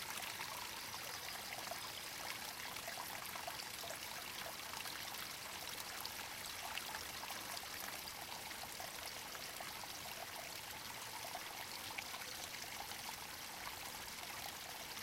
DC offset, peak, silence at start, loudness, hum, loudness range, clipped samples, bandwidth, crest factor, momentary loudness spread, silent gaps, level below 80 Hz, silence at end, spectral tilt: under 0.1%; -26 dBFS; 0 s; -46 LUFS; none; 1 LU; under 0.1%; 17 kHz; 22 dB; 2 LU; none; -72 dBFS; 0 s; -0.5 dB/octave